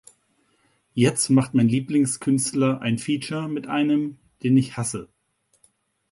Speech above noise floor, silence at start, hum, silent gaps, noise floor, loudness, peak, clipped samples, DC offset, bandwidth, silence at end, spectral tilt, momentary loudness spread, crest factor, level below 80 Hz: 47 dB; 0.95 s; none; none; -68 dBFS; -22 LUFS; -6 dBFS; under 0.1%; under 0.1%; 11.5 kHz; 1.1 s; -5.5 dB/octave; 10 LU; 18 dB; -62 dBFS